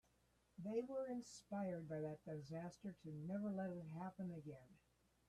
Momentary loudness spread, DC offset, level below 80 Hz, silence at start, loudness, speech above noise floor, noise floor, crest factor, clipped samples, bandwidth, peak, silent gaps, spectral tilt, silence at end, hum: 9 LU; under 0.1%; -80 dBFS; 0.6 s; -50 LUFS; 31 dB; -79 dBFS; 16 dB; under 0.1%; 13 kHz; -34 dBFS; none; -7.5 dB/octave; 0.55 s; none